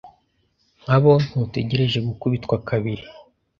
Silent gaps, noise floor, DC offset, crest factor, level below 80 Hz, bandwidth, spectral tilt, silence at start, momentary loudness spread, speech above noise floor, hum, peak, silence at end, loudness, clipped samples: none; -66 dBFS; under 0.1%; 20 dB; -50 dBFS; 7.2 kHz; -8 dB/octave; 0.05 s; 12 LU; 46 dB; none; -2 dBFS; 0.4 s; -21 LUFS; under 0.1%